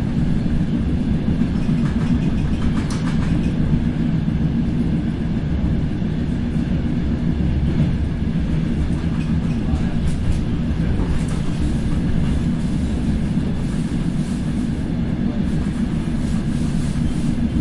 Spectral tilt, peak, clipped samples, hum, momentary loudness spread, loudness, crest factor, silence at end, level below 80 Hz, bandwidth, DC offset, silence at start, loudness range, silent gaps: -8 dB/octave; -4 dBFS; under 0.1%; none; 3 LU; -21 LUFS; 14 dB; 0 s; -26 dBFS; 11.5 kHz; under 0.1%; 0 s; 2 LU; none